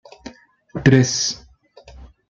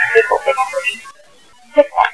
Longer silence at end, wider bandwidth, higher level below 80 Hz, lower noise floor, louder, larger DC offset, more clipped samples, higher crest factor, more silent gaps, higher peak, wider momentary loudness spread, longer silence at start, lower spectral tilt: first, 0.25 s vs 0 s; second, 7.6 kHz vs 11 kHz; about the same, -48 dBFS vs -52 dBFS; about the same, -47 dBFS vs -48 dBFS; about the same, -17 LUFS vs -15 LUFS; second, under 0.1% vs 0.4%; second, under 0.1% vs 0.1%; about the same, 20 dB vs 16 dB; neither; about the same, -2 dBFS vs 0 dBFS; first, 25 LU vs 8 LU; first, 0.25 s vs 0 s; first, -4.5 dB/octave vs -2 dB/octave